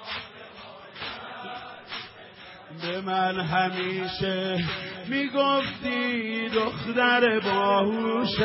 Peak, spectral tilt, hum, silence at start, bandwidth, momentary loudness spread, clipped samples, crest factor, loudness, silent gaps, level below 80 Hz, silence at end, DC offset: -8 dBFS; -9 dB/octave; none; 0 s; 5.8 kHz; 20 LU; under 0.1%; 18 dB; -26 LUFS; none; -58 dBFS; 0 s; under 0.1%